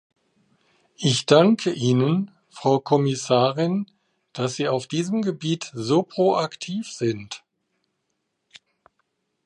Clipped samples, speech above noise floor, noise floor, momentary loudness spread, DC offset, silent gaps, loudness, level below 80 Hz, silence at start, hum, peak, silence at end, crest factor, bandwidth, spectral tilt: under 0.1%; 54 dB; -76 dBFS; 13 LU; under 0.1%; none; -22 LUFS; -68 dBFS; 1 s; none; -2 dBFS; 2.1 s; 22 dB; 11 kHz; -5.5 dB/octave